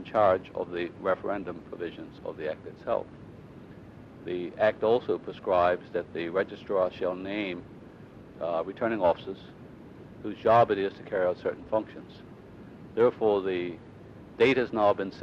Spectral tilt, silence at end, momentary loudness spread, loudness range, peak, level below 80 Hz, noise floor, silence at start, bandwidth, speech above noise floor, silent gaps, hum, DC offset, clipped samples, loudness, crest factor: -7.5 dB/octave; 0 s; 24 LU; 6 LU; -10 dBFS; -60 dBFS; -48 dBFS; 0 s; 7.4 kHz; 20 dB; none; none; under 0.1%; under 0.1%; -28 LUFS; 18 dB